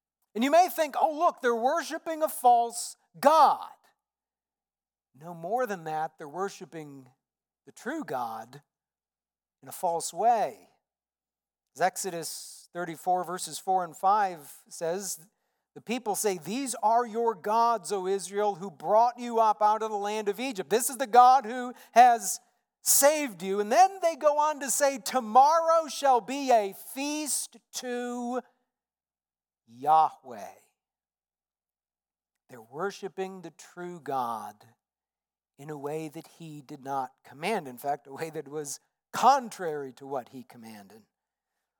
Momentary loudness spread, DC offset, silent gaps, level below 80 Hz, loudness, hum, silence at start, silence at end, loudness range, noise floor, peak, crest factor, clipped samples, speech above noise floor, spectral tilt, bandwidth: 20 LU; under 0.1%; none; under -90 dBFS; -27 LUFS; none; 0.35 s; 0.8 s; 14 LU; under -90 dBFS; -6 dBFS; 24 dB; under 0.1%; over 63 dB; -2.5 dB/octave; 19 kHz